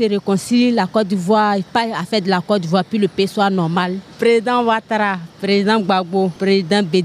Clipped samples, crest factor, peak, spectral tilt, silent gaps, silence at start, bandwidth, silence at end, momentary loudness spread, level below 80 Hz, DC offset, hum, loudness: under 0.1%; 14 dB; -2 dBFS; -6 dB/octave; none; 0 s; 13.5 kHz; 0 s; 4 LU; -60 dBFS; under 0.1%; none; -17 LUFS